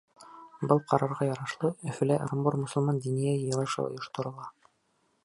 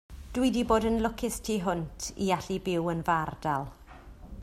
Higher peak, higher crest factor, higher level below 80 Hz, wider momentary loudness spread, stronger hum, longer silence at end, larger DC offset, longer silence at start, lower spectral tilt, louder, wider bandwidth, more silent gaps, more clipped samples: first, -8 dBFS vs -12 dBFS; about the same, 22 dB vs 18 dB; second, -70 dBFS vs -46 dBFS; about the same, 11 LU vs 11 LU; neither; first, 0.75 s vs 0 s; neither; about the same, 0.2 s vs 0.1 s; first, -7 dB/octave vs -5 dB/octave; about the same, -30 LUFS vs -30 LUFS; second, 11.5 kHz vs 15.5 kHz; neither; neither